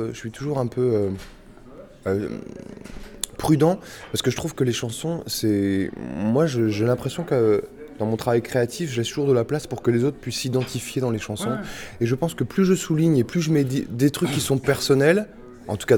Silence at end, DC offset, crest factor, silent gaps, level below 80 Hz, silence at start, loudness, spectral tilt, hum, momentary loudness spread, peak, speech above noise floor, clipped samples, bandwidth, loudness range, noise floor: 0 s; under 0.1%; 20 dB; none; -50 dBFS; 0 s; -23 LUFS; -6 dB/octave; none; 12 LU; -4 dBFS; 21 dB; under 0.1%; 19.5 kHz; 4 LU; -44 dBFS